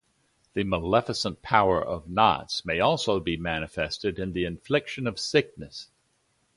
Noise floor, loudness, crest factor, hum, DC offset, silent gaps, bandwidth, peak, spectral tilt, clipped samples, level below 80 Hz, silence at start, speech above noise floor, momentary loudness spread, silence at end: -70 dBFS; -26 LUFS; 24 dB; none; under 0.1%; none; 11.5 kHz; -4 dBFS; -5 dB/octave; under 0.1%; -50 dBFS; 0.55 s; 44 dB; 9 LU; 0.7 s